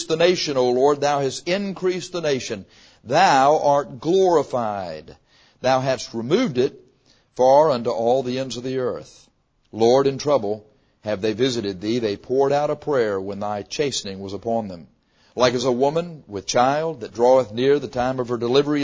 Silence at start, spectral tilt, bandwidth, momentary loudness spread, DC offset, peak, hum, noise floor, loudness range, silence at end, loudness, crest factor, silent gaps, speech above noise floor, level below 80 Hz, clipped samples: 0 s; -5 dB/octave; 8 kHz; 12 LU; under 0.1%; -2 dBFS; none; -58 dBFS; 4 LU; 0 s; -21 LUFS; 18 dB; none; 38 dB; -56 dBFS; under 0.1%